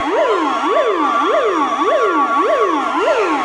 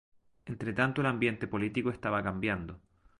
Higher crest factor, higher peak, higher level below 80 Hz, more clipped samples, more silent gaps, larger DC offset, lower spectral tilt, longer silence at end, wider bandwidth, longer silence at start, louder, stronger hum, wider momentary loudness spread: second, 12 dB vs 20 dB; first, -4 dBFS vs -12 dBFS; about the same, -58 dBFS vs -56 dBFS; neither; neither; neither; second, -3 dB/octave vs -7.5 dB/octave; second, 0 s vs 0.45 s; about the same, 11 kHz vs 11.5 kHz; second, 0 s vs 0.45 s; first, -15 LUFS vs -32 LUFS; neither; second, 2 LU vs 13 LU